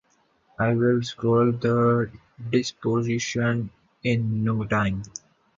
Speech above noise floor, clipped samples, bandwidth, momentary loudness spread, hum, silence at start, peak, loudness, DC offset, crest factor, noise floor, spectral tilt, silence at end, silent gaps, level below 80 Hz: 41 dB; under 0.1%; 7.6 kHz; 12 LU; none; 0.6 s; -8 dBFS; -24 LUFS; under 0.1%; 16 dB; -64 dBFS; -6.5 dB/octave; 0.4 s; none; -52 dBFS